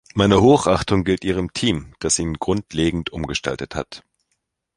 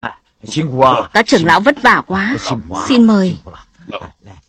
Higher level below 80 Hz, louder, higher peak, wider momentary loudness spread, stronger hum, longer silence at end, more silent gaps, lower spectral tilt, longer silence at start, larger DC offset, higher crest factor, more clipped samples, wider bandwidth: first, -38 dBFS vs -46 dBFS; second, -20 LUFS vs -12 LUFS; about the same, 0 dBFS vs 0 dBFS; second, 14 LU vs 19 LU; neither; first, 0.8 s vs 0.15 s; neither; about the same, -5 dB/octave vs -5 dB/octave; about the same, 0.15 s vs 0.05 s; neither; first, 20 dB vs 14 dB; neither; about the same, 11.5 kHz vs 10.5 kHz